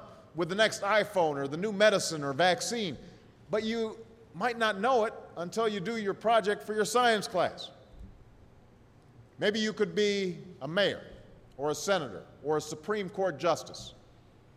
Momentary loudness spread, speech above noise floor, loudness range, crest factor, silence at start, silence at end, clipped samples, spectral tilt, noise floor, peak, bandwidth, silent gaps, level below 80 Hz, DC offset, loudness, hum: 15 LU; 28 dB; 5 LU; 20 dB; 0 s; 0.65 s; under 0.1%; -3.5 dB/octave; -58 dBFS; -10 dBFS; 15.5 kHz; none; -64 dBFS; under 0.1%; -30 LUFS; none